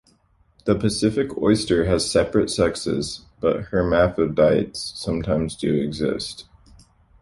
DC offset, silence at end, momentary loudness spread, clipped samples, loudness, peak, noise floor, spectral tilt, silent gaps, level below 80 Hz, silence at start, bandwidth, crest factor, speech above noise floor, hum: under 0.1%; 0.8 s; 10 LU; under 0.1%; -22 LUFS; -4 dBFS; -60 dBFS; -5.5 dB/octave; none; -42 dBFS; 0.65 s; 11.5 kHz; 18 dB; 39 dB; none